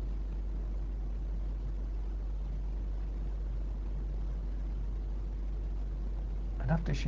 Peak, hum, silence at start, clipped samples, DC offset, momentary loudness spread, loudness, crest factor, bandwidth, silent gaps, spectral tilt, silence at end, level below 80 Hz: -18 dBFS; none; 0 s; under 0.1%; under 0.1%; 1 LU; -39 LUFS; 16 dB; 7 kHz; none; -7.5 dB/octave; 0 s; -36 dBFS